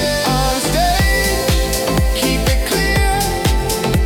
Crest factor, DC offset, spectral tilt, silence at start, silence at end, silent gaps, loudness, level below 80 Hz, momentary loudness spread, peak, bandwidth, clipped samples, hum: 12 dB; under 0.1%; -4 dB/octave; 0 s; 0 s; none; -16 LUFS; -20 dBFS; 2 LU; -4 dBFS; 19 kHz; under 0.1%; none